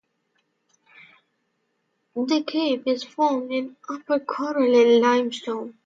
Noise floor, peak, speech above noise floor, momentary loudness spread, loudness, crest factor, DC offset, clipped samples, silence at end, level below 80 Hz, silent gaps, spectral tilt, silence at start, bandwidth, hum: -73 dBFS; -8 dBFS; 51 dB; 14 LU; -22 LUFS; 16 dB; under 0.1%; under 0.1%; 0.15 s; -78 dBFS; none; -4 dB/octave; 2.15 s; 7.8 kHz; none